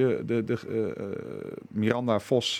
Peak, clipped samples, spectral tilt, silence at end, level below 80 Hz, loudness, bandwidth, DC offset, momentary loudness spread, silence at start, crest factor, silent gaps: -8 dBFS; under 0.1%; -5.5 dB/octave; 0 s; -70 dBFS; -29 LUFS; 15 kHz; under 0.1%; 11 LU; 0 s; 20 dB; none